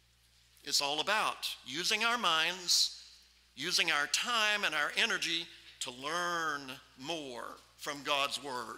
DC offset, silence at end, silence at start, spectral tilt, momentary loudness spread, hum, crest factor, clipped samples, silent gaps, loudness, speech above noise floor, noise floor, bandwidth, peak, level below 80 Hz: under 0.1%; 0 s; 0.65 s; -0.5 dB/octave; 15 LU; none; 22 dB; under 0.1%; none; -32 LUFS; 33 dB; -67 dBFS; 16 kHz; -14 dBFS; -72 dBFS